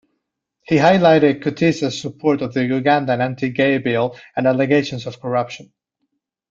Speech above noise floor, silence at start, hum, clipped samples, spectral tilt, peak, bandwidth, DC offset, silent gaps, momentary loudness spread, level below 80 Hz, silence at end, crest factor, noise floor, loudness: 58 dB; 0.7 s; none; under 0.1%; -6.5 dB/octave; -2 dBFS; 7.6 kHz; under 0.1%; none; 10 LU; -58 dBFS; 0.85 s; 16 dB; -75 dBFS; -18 LUFS